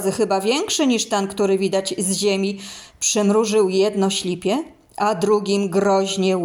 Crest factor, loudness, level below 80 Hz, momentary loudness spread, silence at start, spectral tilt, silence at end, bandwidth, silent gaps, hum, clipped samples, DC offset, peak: 12 dB; -19 LUFS; -60 dBFS; 6 LU; 0 s; -4 dB/octave; 0 s; 18.5 kHz; none; none; under 0.1%; under 0.1%; -6 dBFS